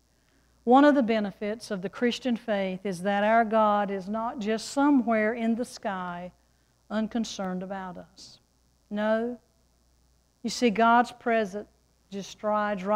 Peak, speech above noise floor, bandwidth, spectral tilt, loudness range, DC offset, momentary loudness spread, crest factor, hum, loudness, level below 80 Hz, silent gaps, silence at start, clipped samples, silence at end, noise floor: -10 dBFS; 40 dB; 13 kHz; -5.5 dB/octave; 9 LU; under 0.1%; 16 LU; 18 dB; none; -26 LUFS; -64 dBFS; none; 0.65 s; under 0.1%; 0 s; -66 dBFS